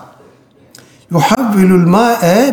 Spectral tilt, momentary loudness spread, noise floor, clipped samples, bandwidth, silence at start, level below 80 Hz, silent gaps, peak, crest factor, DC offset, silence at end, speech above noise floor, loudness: -6.5 dB/octave; 5 LU; -45 dBFS; under 0.1%; over 20 kHz; 1.1 s; -48 dBFS; none; 0 dBFS; 10 dB; under 0.1%; 0 s; 36 dB; -10 LUFS